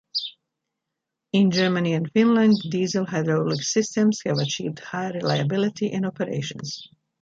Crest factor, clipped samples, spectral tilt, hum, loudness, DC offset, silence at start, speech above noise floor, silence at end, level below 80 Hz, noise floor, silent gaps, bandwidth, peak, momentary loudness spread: 16 dB; under 0.1%; -5.5 dB/octave; none; -23 LUFS; under 0.1%; 0.15 s; 61 dB; 0.35 s; -66 dBFS; -83 dBFS; none; 7.8 kHz; -6 dBFS; 11 LU